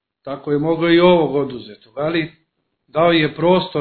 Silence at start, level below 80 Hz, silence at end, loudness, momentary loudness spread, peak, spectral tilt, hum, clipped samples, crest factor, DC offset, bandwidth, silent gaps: 0.25 s; -50 dBFS; 0 s; -17 LUFS; 17 LU; 0 dBFS; -9.5 dB/octave; none; under 0.1%; 18 dB; under 0.1%; 4.5 kHz; none